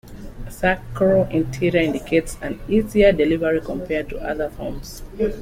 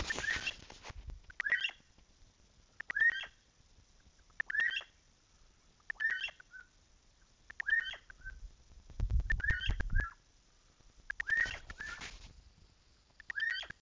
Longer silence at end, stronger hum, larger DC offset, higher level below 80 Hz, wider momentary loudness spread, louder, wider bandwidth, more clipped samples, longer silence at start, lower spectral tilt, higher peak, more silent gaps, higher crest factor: about the same, 0 s vs 0.1 s; neither; neither; first, -36 dBFS vs -46 dBFS; second, 15 LU vs 21 LU; first, -21 LUFS vs -36 LUFS; first, 16.5 kHz vs 7.6 kHz; neither; about the same, 0.05 s vs 0 s; first, -6.5 dB/octave vs -2.5 dB/octave; first, -4 dBFS vs -20 dBFS; neither; about the same, 18 dB vs 20 dB